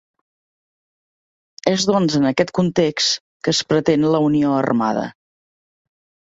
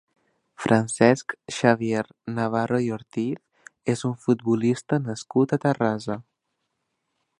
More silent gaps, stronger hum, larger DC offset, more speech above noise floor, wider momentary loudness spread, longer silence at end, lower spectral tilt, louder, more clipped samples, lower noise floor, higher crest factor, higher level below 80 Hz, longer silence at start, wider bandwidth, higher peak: first, 3.20-3.40 s vs none; neither; neither; first, over 73 dB vs 55 dB; second, 6 LU vs 12 LU; about the same, 1.1 s vs 1.2 s; about the same, -5 dB/octave vs -6 dB/octave; first, -18 LUFS vs -24 LUFS; neither; first, under -90 dBFS vs -78 dBFS; about the same, 18 dB vs 22 dB; first, -56 dBFS vs -64 dBFS; first, 1.65 s vs 0.6 s; second, 8 kHz vs 11 kHz; about the same, -2 dBFS vs -2 dBFS